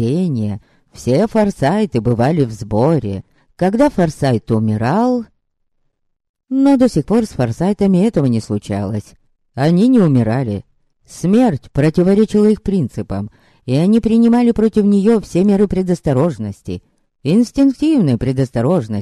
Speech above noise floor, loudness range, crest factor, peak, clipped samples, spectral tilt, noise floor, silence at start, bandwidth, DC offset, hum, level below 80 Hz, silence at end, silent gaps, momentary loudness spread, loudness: 51 dB; 3 LU; 12 dB; -2 dBFS; under 0.1%; -8 dB/octave; -65 dBFS; 0 s; 12.5 kHz; under 0.1%; none; -40 dBFS; 0 s; 6.29-6.34 s; 12 LU; -15 LUFS